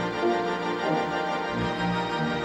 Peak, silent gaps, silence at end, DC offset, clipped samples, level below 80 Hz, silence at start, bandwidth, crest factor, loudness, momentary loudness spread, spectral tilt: -14 dBFS; none; 0 s; under 0.1%; under 0.1%; -52 dBFS; 0 s; 10.5 kHz; 14 dB; -27 LUFS; 2 LU; -6 dB/octave